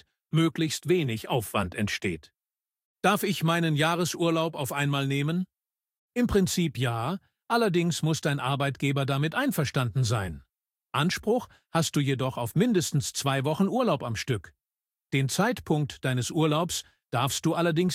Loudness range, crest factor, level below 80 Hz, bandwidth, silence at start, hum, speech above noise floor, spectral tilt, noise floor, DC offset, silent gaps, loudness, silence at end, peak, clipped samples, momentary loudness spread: 1 LU; 20 dB; -54 dBFS; 16.5 kHz; 0.35 s; none; over 64 dB; -5 dB/octave; under -90 dBFS; under 0.1%; 2.85-2.95 s, 5.98-6.09 s; -27 LUFS; 0 s; -8 dBFS; under 0.1%; 6 LU